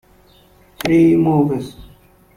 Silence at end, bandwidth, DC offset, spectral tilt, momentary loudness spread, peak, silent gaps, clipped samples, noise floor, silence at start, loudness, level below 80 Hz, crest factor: 0.55 s; 15 kHz; under 0.1%; -7.5 dB/octave; 13 LU; -2 dBFS; none; under 0.1%; -50 dBFS; 0.85 s; -15 LUFS; -46 dBFS; 16 dB